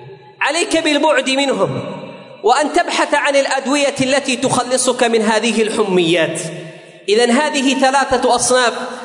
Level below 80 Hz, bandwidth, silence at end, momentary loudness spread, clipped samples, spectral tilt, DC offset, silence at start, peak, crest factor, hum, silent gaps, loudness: -54 dBFS; 11 kHz; 0 s; 9 LU; under 0.1%; -3 dB/octave; under 0.1%; 0 s; -2 dBFS; 14 dB; none; none; -15 LUFS